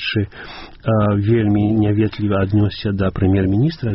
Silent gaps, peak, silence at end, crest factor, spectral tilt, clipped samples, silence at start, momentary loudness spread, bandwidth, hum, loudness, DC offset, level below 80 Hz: none; -4 dBFS; 0 s; 12 dB; -7 dB/octave; under 0.1%; 0 s; 9 LU; 5.8 kHz; none; -18 LUFS; under 0.1%; -38 dBFS